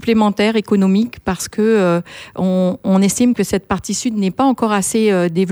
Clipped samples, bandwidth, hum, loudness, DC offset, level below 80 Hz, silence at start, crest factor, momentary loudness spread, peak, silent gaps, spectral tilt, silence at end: under 0.1%; over 20 kHz; none; -16 LUFS; under 0.1%; -46 dBFS; 0 s; 14 dB; 7 LU; -2 dBFS; none; -5.5 dB/octave; 0 s